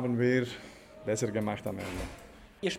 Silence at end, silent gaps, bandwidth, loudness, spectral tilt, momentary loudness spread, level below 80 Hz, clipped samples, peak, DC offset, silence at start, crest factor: 0 s; none; 16 kHz; -33 LUFS; -5.5 dB/octave; 21 LU; -54 dBFS; under 0.1%; -14 dBFS; under 0.1%; 0 s; 18 dB